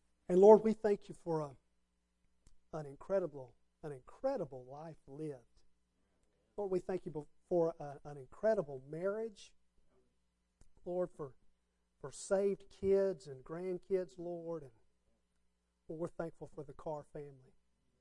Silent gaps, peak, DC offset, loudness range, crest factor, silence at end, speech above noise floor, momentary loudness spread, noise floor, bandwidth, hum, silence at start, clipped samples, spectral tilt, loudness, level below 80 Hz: none; -12 dBFS; under 0.1%; 8 LU; 26 dB; 0.65 s; 44 dB; 18 LU; -80 dBFS; 11 kHz; none; 0.3 s; under 0.1%; -7.5 dB/octave; -36 LUFS; -68 dBFS